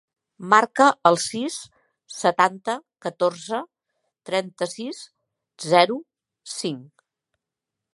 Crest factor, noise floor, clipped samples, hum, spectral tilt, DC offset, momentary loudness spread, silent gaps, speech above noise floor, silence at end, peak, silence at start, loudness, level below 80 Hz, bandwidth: 24 dB; -86 dBFS; under 0.1%; none; -3.5 dB/octave; under 0.1%; 18 LU; none; 64 dB; 1.1 s; -2 dBFS; 0.4 s; -22 LUFS; -74 dBFS; 11.5 kHz